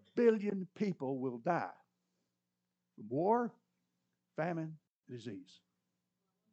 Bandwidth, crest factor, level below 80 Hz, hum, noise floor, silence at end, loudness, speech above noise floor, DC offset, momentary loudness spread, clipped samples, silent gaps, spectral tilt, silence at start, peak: 8 kHz; 22 dB; under -90 dBFS; 60 Hz at -65 dBFS; -88 dBFS; 1.1 s; -37 LUFS; 52 dB; under 0.1%; 18 LU; under 0.1%; 4.90-5.01 s; -8 dB/octave; 0.15 s; -18 dBFS